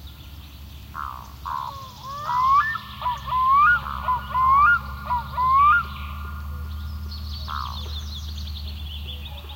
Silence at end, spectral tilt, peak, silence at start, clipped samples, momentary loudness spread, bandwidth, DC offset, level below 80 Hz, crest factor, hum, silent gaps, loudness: 0 s; -4 dB/octave; -8 dBFS; 0 s; under 0.1%; 19 LU; 16.5 kHz; under 0.1%; -38 dBFS; 16 dB; none; none; -22 LUFS